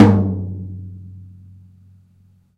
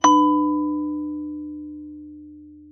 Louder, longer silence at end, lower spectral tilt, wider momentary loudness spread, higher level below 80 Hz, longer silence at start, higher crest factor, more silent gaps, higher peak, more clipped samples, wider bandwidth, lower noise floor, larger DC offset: about the same, -20 LUFS vs -22 LUFS; first, 1.35 s vs 0.05 s; first, -9.5 dB/octave vs -3.5 dB/octave; about the same, 26 LU vs 24 LU; first, -48 dBFS vs -58 dBFS; about the same, 0 s vs 0.05 s; about the same, 20 dB vs 20 dB; neither; first, 0 dBFS vs -4 dBFS; first, 0.1% vs under 0.1%; about the same, 6.6 kHz vs 6.6 kHz; first, -54 dBFS vs -43 dBFS; neither